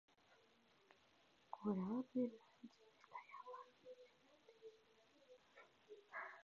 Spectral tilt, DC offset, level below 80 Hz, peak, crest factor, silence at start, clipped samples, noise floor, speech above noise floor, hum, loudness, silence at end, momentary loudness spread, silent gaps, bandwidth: -6.5 dB/octave; under 0.1%; -90 dBFS; -30 dBFS; 22 dB; 0.3 s; under 0.1%; -75 dBFS; 30 dB; none; -49 LUFS; 0 s; 23 LU; none; 7 kHz